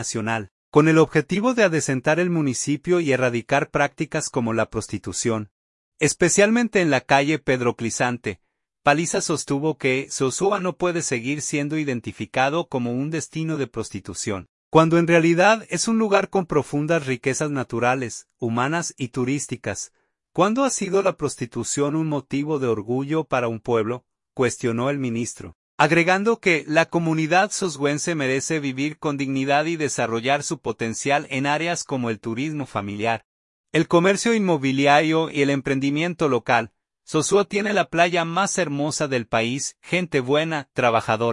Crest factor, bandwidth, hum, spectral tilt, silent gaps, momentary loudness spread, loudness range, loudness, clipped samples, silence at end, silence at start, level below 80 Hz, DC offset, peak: 20 dB; 11.5 kHz; none; -4.5 dB/octave; 0.51-0.72 s, 5.51-5.92 s, 14.49-14.71 s, 25.55-25.78 s, 33.25-33.64 s; 10 LU; 4 LU; -22 LUFS; under 0.1%; 0 s; 0 s; -58 dBFS; under 0.1%; -2 dBFS